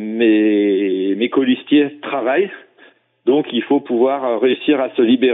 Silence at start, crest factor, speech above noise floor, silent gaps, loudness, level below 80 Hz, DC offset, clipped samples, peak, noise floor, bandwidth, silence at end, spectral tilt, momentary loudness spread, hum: 0 s; 12 dB; 35 dB; none; -16 LUFS; -68 dBFS; under 0.1%; under 0.1%; -4 dBFS; -50 dBFS; 4 kHz; 0 s; -3.5 dB/octave; 5 LU; none